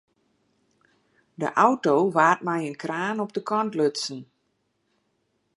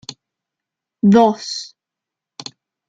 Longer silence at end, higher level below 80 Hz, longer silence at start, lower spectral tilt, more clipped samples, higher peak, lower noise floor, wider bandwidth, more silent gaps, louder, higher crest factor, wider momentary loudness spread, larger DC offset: first, 1.35 s vs 1.2 s; second, -78 dBFS vs -58 dBFS; first, 1.4 s vs 0.1 s; about the same, -5 dB/octave vs -6 dB/octave; neither; about the same, -4 dBFS vs -2 dBFS; second, -73 dBFS vs -85 dBFS; first, 11.5 kHz vs 7.8 kHz; neither; second, -24 LUFS vs -16 LUFS; about the same, 22 dB vs 18 dB; second, 11 LU vs 24 LU; neither